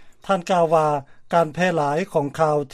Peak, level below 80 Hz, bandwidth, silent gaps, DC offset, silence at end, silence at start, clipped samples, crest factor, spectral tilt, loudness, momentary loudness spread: -4 dBFS; -56 dBFS; 14 kHz; none; under 0.1%; 0.05 s; 0 s; under 0.1%; 16 dB; -6 dB/octave; -21 LUFS; 6 LU